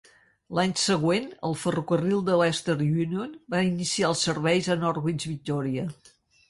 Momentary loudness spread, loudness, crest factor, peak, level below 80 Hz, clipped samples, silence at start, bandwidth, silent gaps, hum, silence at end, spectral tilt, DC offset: 8 LU; -26 LUFS; 16 dB; -10 dBFS; -62 dBFS; under 0.1%; 0.5 s; 11.5 kHz; none; none; 0.55 s; -5 dB/octave; under 0.1%